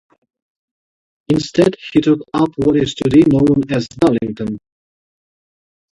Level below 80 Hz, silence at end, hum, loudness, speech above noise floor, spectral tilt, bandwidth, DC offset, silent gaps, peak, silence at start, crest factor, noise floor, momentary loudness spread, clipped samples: -46 dBFS; 1.4 s; none; -15 LUFS; over 76 dB; -7 dB/octave; 11 kHz; under 0.1%; none; 0 dBFS; 1.3 s; 16 dB; under -90 dBFS; 10 LU; under 0.1%